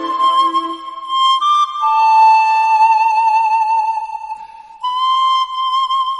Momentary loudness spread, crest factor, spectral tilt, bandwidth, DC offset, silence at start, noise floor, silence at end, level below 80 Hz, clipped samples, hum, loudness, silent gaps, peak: 15 LU; 10 dB; 0.5 dB/octave; 10.5 kHz; under 0.1%; 0 s; -34 dBFS; 0 s; -64 dBFS; under 0.1%; none; -13 LUFS; none; -4 dBFS